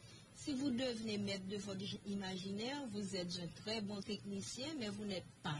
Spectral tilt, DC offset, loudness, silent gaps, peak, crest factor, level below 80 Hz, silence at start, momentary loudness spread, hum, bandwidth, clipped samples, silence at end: -4.5 dB/octave; under 0.1%; -44 LUFS; none; -28 dBFS; 14 dB; -72 dBFS; 0 s; 5 LU; none; 11.5 kHz; under 0.1%; 0 s